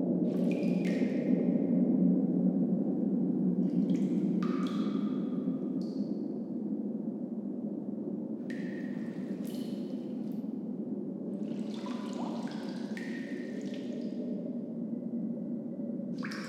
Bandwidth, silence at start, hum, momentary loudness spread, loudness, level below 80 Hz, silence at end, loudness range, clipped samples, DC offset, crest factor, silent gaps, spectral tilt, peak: 12 kHz; 0 s; none; 9 LU; -33 LUFS; -84 dBFS; 0 s; 8 LU; under 0.1%; under 0.1%; 18 dB; none; -8.5 dB/octave; -16 dBFS